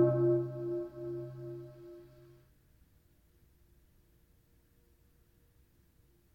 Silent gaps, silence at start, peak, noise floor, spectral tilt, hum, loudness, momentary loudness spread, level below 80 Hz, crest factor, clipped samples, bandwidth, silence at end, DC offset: none; 0 s; -16 dBFS; -68 dBFS; -11 dB/octave; none; -35 LUFS; 25 LU; -68 dBFS; 22 dB; under 0.1%; 2.7 kHz; 4.1 s; under 0.1%